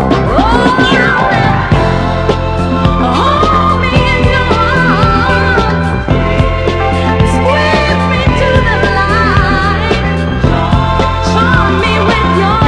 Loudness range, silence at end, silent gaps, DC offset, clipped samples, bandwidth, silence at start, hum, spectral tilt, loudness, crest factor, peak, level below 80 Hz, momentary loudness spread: 1 LU; 0 s; none; under 0.1%; 0.8%; 10.5 kHz; 0 s; none; -6.5 dB/octave; -10 LUFS; 10 dB; 0 dBFS; -18 dBFS; 4 LU